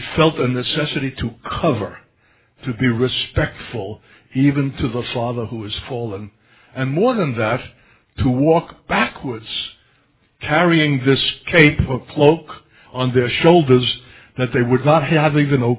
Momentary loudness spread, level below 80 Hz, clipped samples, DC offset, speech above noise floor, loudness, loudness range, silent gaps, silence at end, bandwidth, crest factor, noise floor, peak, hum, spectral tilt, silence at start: 15 LU; -40 dBFS; under 0.1%; under 0.1%; 42 dB; -18 LUFS; 7 LU; none; 0 s; 4 kHz; 18 dB; -59 dBFS; 0 dBFS; none; -10.5 dB/octave; 0 s